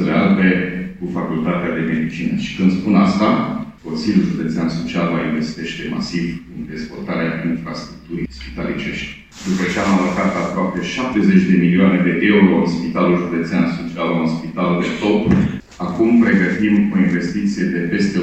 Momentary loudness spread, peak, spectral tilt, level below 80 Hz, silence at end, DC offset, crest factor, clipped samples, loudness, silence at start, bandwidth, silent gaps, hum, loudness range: 13 LU; 0 dBFS; -7 dB/octave; -44 dBFS; 0 s; 0.2%; 16 dB; under 0.1%; -17 LUFS; 0 s; 8.2 kHz; none; none; 8 LU